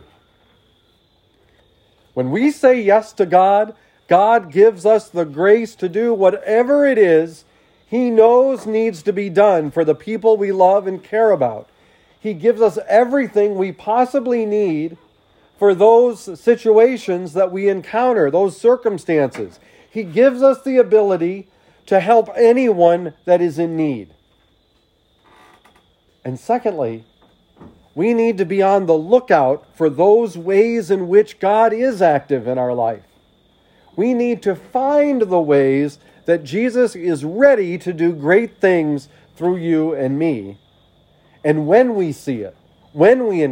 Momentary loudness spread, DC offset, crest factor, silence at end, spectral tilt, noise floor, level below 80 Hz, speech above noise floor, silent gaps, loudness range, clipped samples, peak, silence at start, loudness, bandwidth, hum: 11 LU; under 0.1%; 16 dB; 0 s; -7 dB/octave; -59 dBFS; -62 dBFS; 44 dB; none; 5 LU; under 0.1%; 0 dBFS; 2.15 s; -16 LUFS; 11 kHz; none